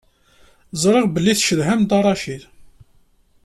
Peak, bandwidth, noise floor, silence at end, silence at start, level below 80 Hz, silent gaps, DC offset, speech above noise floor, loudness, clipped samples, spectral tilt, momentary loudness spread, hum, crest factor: -4 dBFS; 13.5 kHz; -55 dBFS; 0.8 s; 0.75 s; -50 dBFS; none; under 0.1%; 38 dB; -17 LUFS; under 0.1%; -4.5 dB/octave; 14 LU; none; 16 dB